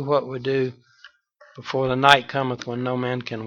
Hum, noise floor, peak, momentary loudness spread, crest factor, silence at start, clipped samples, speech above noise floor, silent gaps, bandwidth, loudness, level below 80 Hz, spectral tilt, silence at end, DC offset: none; -53 dBFS; 0 dBFS; 13 LU; 24 dB; 0 s; under 0.1%; 31 dB; none; 18 kHz; -22 LUFS; -58 dBFS; -5 dB/octave; 0 s; under 0.1%